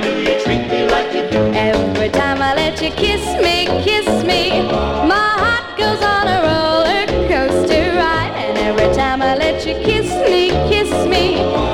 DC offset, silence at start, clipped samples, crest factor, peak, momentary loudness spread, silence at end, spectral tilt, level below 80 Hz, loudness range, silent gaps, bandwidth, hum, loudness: under 0.1%; 0 s; under 0.1%; 14 dB; -2 dBFS; 3 LU; 0 s; -5 dB/octave; -30 dBFS; 1 LU; none; 16.5 kHz; none; -15 LUFS